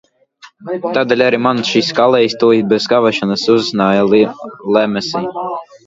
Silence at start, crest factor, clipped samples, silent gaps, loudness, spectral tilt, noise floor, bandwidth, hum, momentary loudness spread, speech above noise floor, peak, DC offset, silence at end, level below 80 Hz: 0.45 s; 14 dB; under 0.1%; none; -14 LUFS; -5 dB/octave; -44 dBFS; 7.8 kHz; none; 11 LU; 31 dB; 0 dBFS; under 0.1%; 0.1 s; -56 dBFS